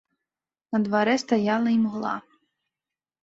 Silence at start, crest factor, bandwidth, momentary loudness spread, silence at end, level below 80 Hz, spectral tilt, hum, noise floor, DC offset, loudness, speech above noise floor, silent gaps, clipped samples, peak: 0.7 s; 18 dB; 7.8 kHz; 8 LU; 1 s; -70 dBFS; -5.5 dB/octave; none; under -90 dBFS; under 0.1%; -24 LUFS; over 67 dB; none; under 0.1%; -10 dBFS